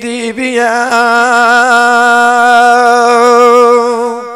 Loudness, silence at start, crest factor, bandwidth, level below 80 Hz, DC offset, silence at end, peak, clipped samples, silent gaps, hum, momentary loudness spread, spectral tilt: -7 LUFS; 0 s; 8 dB; 15 kHz; -56 dBFS; under 0.1%; 0 s; 0 dBFS; 4%; none; none; 8 LU; -2 dB/octave